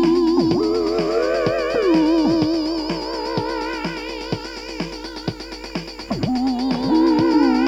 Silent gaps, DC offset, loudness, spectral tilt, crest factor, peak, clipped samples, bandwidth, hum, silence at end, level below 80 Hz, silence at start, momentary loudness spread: none; under 0.1%; -20 LUFS; -6 dB/octave; 14 dB; -6 dBFS; under 0.1%; 9.2 kHz; none; 0 s; -42 dBFS; 0 s; 13 LU